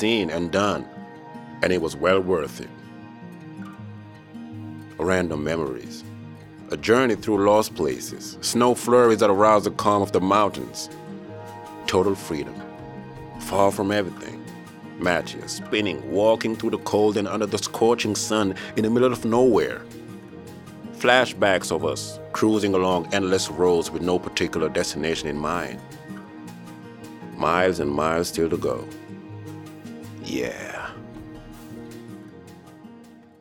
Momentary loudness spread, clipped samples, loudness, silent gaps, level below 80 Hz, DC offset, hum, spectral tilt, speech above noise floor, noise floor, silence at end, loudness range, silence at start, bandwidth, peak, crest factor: 21 LU; under 0.1%; -22 LUFS; none; -54 dBFS; under 0.1%; none; -4.5 dB/octave; 25 dB; -47 dBFS; 0.25 s; 9 LU; 0 s; 17.5 kHz; -2 dBFS; 22 dB